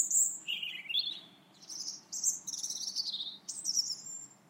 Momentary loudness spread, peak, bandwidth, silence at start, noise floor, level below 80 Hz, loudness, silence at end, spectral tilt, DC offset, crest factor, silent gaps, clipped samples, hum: 10 LU; -16 dBFS; 16 kHz; 0 s; -57 dBFS; under -90 dBFS; -34 LUFS; 0.15 s; 3 dB/octave; under 0.1%; 20 dB; none; under 0.1%; none